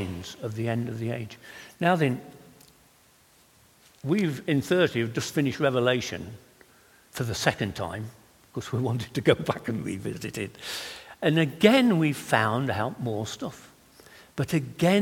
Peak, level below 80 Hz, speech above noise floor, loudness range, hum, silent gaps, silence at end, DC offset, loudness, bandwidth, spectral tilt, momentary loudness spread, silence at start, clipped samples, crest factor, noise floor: -2 dBFS; -60 dBFS; 33 dB; 6 LU; none; none; 0 s; under 0.1%; -27 LUFS; 17.5 kHz; -5.5 dB/octave; 15 LU; 0 s; under 0.1%; 24 dB; -59 dBFS